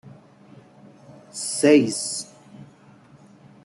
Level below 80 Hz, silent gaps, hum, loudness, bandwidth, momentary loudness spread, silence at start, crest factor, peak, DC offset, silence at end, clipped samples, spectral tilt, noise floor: -72 dBFS; none; none; -21 LUFS; 12 kHz; 20 LU; 0.05 s; 22 dB; -4 dBFS; under 0.1%; 1 s; under 0.1%; -4 dB/octave; -51 dBFS